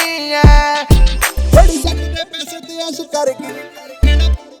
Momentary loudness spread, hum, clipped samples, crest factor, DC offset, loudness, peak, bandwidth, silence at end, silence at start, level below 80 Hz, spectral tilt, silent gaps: 15 LU; none; 0.4%; 12 dB; under 0.1%; -14 LUFS; 0 dBFS; 20 kHz; 0.25 s; 0 s; -14 dBFS; -5 dB/octave; none